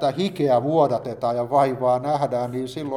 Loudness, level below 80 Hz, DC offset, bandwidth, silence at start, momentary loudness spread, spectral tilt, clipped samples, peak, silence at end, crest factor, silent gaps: -22 LUFS; -60 dBFS; under 0.1%; 14 kHz; 0 s; 6 LU; -7 dB/octave; under 0.1%; -6 dBFS; 0 s; 16 dB; none